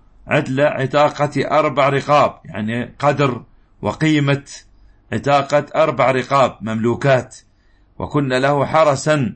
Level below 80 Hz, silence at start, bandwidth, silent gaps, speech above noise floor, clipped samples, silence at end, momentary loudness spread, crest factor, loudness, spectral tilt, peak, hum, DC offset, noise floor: -48 dBFS; 0.25 s; 8.8 kHz; none; 37 dB; under 0.1%; 0 s; 10 LU; 16 dB; -17 LUFS; -6 dB/octave; -2 dBFS; none; under 0.1%; -53 dBFS